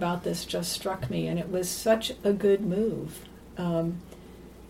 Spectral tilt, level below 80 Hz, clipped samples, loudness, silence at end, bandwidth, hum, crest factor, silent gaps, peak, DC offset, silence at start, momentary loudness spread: -5 dB/octave; -52 dBFS; under 0.1%; -28 LUFS; 0 s; 16.5 kHz; none; 18 dB; none; -12 dBFS; under 0.1%; 0 s; 18 LU